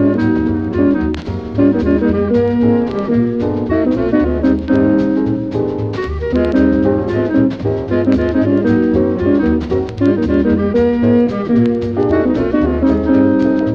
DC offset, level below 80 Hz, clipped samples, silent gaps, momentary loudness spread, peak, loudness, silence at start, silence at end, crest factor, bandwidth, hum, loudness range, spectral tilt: under 0.1%; -30 dBFS; under 0.1%; none; 5 LU; 0 dBFS; -14 LUFS; 0 s; 0 s; 14 dB; 6.6 kHz; none; 1 LU; -9.5 dB/octave